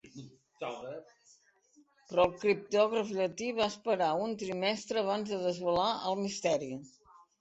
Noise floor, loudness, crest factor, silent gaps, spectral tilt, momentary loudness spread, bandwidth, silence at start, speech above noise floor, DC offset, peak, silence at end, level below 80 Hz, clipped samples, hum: -67 dBFS; -32 LUFS; 20 dB; none; -4.5 dB/octave; 14 LU; 8.4 kHz; 0.05 s; 35 dB; under 0.1%; -12 dBFS; 0.5 s; -68 dBFS; under 0.1%; none